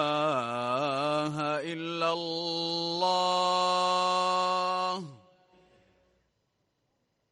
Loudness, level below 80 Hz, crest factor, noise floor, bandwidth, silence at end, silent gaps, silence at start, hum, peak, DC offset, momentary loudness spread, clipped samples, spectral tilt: -28 LUFS; -78 dBFS; 16 dB; -77 dBFS; 11.5 kHz; 2.15 s; none; 0 s; none; -14 dBFS; under 0.1%; 6 LU; under 0.1%; -4 dB/octave